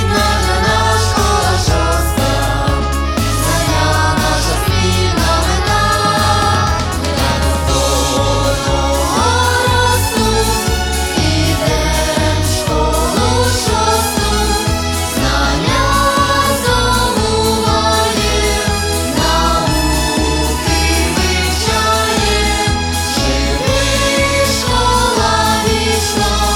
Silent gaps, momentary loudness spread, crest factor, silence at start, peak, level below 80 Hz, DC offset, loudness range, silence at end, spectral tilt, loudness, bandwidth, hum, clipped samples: none; 3 LU; 12 dB; 0 s; 0 dBFS; -20 dBFS; under 0.1%; 1 LU; 0 s; -4 dB/octave; -13 LUFS; 18 kHz; none; under 0.1%